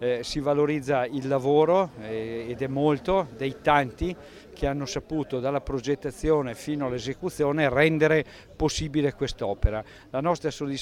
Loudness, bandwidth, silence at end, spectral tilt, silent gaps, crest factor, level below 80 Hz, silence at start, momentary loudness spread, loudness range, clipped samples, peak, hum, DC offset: -26 LUFS; 14 kHz; 0 s; -6 dB/octave; none; 20 dB; -40 dBFS; 0 s; 11 LU; 3 LU; under 0.1%; -6 dBFS; none; under 0.1%